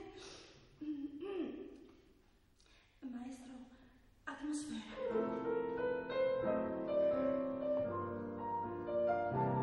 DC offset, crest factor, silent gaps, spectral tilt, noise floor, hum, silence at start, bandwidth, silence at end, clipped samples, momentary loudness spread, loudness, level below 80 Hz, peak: under 0.1%; 16 dB; none; -6.5 dB/octave; -69 dBFS; none; 0 s; 11 kHz; 0 s; under 0.1%; 18 LU; -39 LUFS; -68 dBFS; -24 dBFS